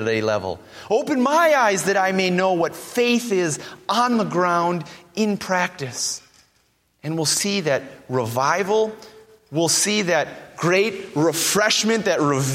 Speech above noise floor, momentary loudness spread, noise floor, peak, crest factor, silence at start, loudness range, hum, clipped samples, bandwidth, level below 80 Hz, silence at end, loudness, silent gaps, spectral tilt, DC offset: 43 dB; 9 LU; -64 dBFS; -4 dBFS; 16 dB; 0 s; 4 LU; none; under 0.1%; 16.5 kHz; -64 dBFS; 0 s; -20 LUFS; none; -3.5 dB/octave; under 0.1%